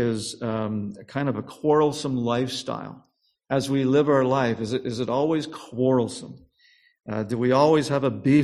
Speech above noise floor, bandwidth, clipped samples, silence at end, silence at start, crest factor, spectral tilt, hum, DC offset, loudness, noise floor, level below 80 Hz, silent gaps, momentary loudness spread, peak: 37 dB; 13 kHz; under 0.1%; 0 s; 0 s; 18 dB; -6.5 dB/octave; none; under 0.1%; -24 LUFS; -60 dBFS; -60 dBFS; none; 13 LU; -6 dBFS